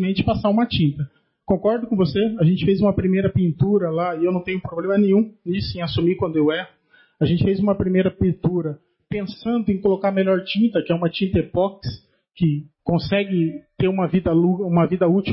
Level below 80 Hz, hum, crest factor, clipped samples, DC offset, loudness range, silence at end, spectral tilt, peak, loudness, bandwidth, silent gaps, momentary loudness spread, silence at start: -44 dBFS; none; 14 dB; under 0.1%; under 0.1%; 2 LU; 0 s; -12 dB/octave; -6 dBFS; -20 LUFS; 5.8 kHz; none; 8 LU; 0 s